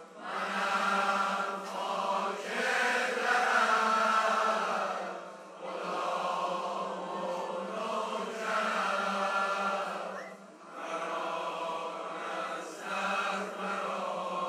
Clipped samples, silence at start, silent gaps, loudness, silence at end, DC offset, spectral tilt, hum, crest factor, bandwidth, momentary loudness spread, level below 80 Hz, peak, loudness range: under 0.1%; 0 s; none; -32 LUFS; 0 s; under 0.1%; -3 dB/octave; none; 18 dB; 15.5 kHz; 12 LU; under -90 dBFS; -14 dBFS; 7 LU